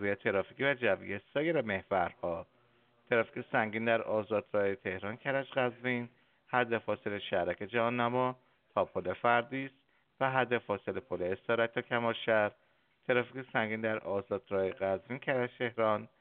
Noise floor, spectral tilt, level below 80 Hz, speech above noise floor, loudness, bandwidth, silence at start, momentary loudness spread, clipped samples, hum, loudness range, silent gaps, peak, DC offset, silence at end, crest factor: -69 dBFS; -3.5 dB/octave; -74 dBFS; 36 dB; -33 LUFS; 4.3 kHz; 0 s; 7 LU; under 0.1%; none; 1 LU; none; -12 dBFS; under 0.1%; 0.15 s; 22 dB